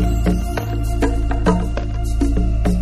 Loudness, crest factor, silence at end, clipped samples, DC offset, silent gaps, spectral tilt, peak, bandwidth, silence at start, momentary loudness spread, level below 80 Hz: -20 LUFS; 14 dB; 0 s; under 0.1%; under 0.1%; none; -7 dB/octave; -4 dBFS; 13 kHz; 0 s; 5 LU; -20 dBFS